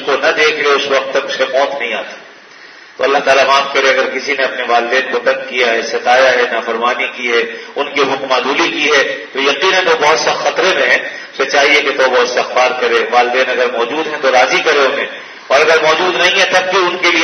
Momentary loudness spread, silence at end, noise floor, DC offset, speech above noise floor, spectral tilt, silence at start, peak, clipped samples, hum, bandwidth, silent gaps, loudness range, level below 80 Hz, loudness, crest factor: 7 LU; 0 s; -37 dBFS; under 0.1%; 24 dB; -1.5 dB/octave; 0 s; 0 dBFS; under 0.1%; none; 12 kHz; none; 2 LU; -60 dBFS; -12 LUFS; 12 dB